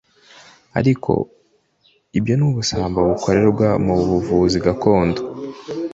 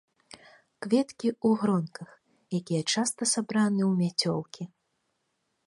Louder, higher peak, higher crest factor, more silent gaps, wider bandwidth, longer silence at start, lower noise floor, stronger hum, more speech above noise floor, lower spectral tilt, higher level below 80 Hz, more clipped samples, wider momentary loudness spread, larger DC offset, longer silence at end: first, -18 LUFS vs -27 LUFS; first, -2 dBFS vs -12 dBFS; about the same, 16 dB vs 18 dB; neither; second, 8 kHz vs 11.5 kHz; about the same, 0.75 s vs 0.8 s; second, -59 dBFS vs -77 dBFS; neither; second, 43 dB vs 50 dB; first, -6.5 dB/octave vs -4.5 dB/octave; first, -40 dBFS vs -74 dBFS; neither; second, 11 LU vs 16 LU; neither; second, 0 s vs 1 s